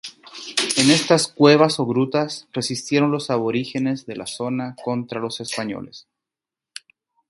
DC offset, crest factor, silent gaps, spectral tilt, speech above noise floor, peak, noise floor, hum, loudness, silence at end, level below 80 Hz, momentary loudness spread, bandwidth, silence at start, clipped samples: under 0.1%; 20 dB; none; -4 dB/octave; 68 dB; 0 dBFS; -88 dBFS; none; -20 LUFS; 1.3 s; -64 dBFS; 20 LU; 11.5 kHz; 0.05 s; under 0.1%